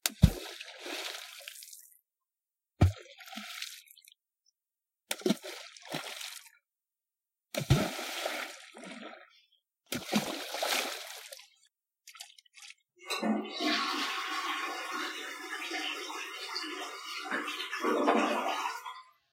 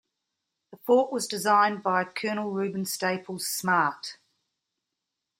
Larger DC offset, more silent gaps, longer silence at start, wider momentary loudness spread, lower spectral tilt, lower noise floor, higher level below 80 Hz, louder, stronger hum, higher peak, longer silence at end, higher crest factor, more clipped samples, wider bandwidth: neither; neither; second, 0.05 s vs 0.7 s; first, 19 LU vs 9 LU; about the same, -4 dB/octave vs -3.5 dB/octave; first, under -90 dBFS vs -85 dBFS; first, -48 dBFS vs -78 dBFS; second, -34 LUFS vs -26 LUFS; neither; first, -4 dBFS vs -10 dBFS; second, 0.3 s vs 1.25 s; first, 32 dB vs 20 dB; neither; about the same, 16.5 kHz vs 16.5 kHz